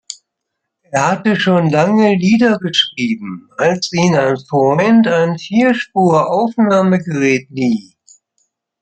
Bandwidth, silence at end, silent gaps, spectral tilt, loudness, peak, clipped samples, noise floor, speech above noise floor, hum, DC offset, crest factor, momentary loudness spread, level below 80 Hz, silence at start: 9 kHz; 1 s; none; -5.5 dB/octave; -14 LUFS; -2 dBFS; under 0.1%; -76 dBFS; 63 dB; none; under 0.1%; 12 dB; 8 LU; -58 dBFS; 0.1 s